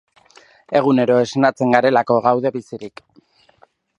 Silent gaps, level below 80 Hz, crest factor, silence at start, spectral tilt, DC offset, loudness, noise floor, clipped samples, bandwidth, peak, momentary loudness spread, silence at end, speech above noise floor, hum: none; -64 dBFS; 18 dB; 0.7 s; -6.5 dB/octave; under 0.1%; -16 LUFS; -55 dBFS; under 0.1%; 9.4 kHz; 0 dBFS; 17 LU; 1.1 s; 39 dB; none